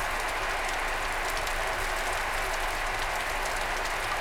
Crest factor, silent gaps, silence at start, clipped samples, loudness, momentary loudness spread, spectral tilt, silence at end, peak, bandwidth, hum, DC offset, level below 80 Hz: 16 dB; none; 0 s; under 0.1%; -29 LUFS; 0 LU; -1.5 dB/octave; 0 s; -14 dBFS; 19 kHz; none; 0.1%; -38 dBFS